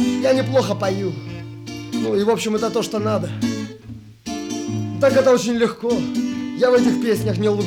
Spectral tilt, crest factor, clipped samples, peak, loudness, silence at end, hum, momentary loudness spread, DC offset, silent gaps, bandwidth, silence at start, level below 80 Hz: -5.5 dB/octave; 14 dB; under 0.1%; -4 dBFS; -20 LUFS; 0 s; none; 16 LU; under 0.1%; none; 17.5 kHz; 0 s; -54 dBFS